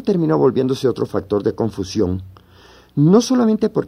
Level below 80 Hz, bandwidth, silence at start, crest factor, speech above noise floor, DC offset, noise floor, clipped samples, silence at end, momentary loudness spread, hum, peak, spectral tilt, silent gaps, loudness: -50 dBFS; 15 kHz; 0 s; 16 dB; 30 dB; under 0.1%; -47 dBFS; under 0.1%; 0 s; 9 LU; none; -2 dBFS; -7 dB/octave; none; -17 LUFS